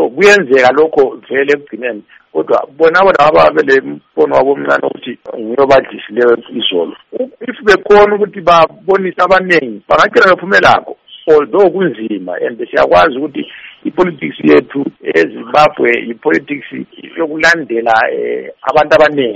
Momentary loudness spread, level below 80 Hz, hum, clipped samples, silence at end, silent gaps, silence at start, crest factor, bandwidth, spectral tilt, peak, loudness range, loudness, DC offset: 14 LU; -44 dBFS; none; 0.3%; 0 s; none; 0 s; 10 dB; 9.2 kHz; -5 dB/octave; 0 dBFS; 3 LU; -11 LUFS; under 0.1%